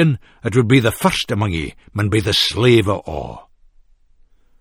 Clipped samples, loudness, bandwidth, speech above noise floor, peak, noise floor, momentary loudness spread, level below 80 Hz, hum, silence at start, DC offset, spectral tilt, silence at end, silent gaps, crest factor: under 0.1%; -17 LUFS; 17.5 kHz; 35 dB; 0 dBFS; -52 dBFS; 13 LU; -40 dBFS; none; 0 s; under 0.1%; -5.5 dB/octave; 1.2 s; none; 18 dB